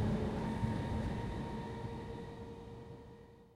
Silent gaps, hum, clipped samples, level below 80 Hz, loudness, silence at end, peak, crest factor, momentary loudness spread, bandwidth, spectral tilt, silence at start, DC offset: none; none; under 0.1%; -50 dBFS; -41 LUFS; 0 s; -22 dBFS; 18 dB; 15 LU; 12.5 kHz; -8 dB/octave; 0 s; under 0.1%